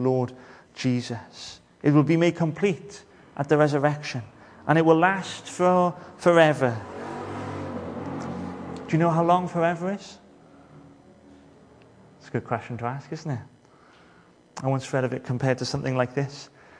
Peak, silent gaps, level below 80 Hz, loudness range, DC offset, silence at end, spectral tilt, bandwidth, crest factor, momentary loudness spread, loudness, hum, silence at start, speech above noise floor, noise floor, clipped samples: -4 dBFS; none; -64 dBFS; 13 LU; under 0.1%; 0.35 s; -6.5 dB/octave; 10.5 kHz; 22 dB; 16 LU; -25 LUFS; none; 0 s; 32 dB; -55 dBFS; under 0.1%